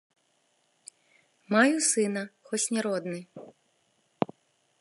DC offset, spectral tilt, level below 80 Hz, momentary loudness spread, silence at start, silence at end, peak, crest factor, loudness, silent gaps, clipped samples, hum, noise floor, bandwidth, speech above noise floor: under 0.1%; -3 dB/octave; -80 dBFS; 17 LU; 1.5 s; 0.55 s; -6 dBFS; 24 dB; -27 LUFS; none; under 0.1%; none; -71 dBFS; 11.5 kHz; 44 dB